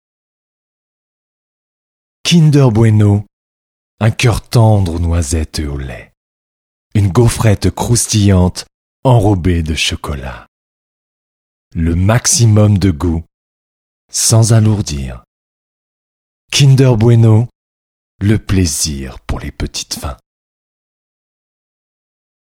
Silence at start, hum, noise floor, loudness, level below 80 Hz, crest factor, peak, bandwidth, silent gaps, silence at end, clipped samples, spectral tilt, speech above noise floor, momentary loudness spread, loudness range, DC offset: 2.25 s; none; under -90 dBFS; -12 LUFS; -30 dBFS; 14 dB; 0 dBFS; 15.5 kHz; 3.33-3.98 s, 6.17-6.91 s, 8.74-9.03 s, 10.48-11.71 s, 13.34-14.09 s, 15.27-16.48 s, 17.55-18.19 s; 2.4 s; under 0.1%; -5.5 dB/octave; over 79 dB; 15 LU; 6 LU; under 0.1%